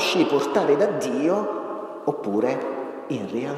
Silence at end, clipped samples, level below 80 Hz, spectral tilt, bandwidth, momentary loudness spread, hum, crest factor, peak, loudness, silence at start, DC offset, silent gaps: 0 s; under 0.1%; -74 dBFS; -5 dB/octave; 13.5 kHz; 10 LU; none; 18 dB; -6 dBFS; -24 LUFS; 0 s; under 0.1%; none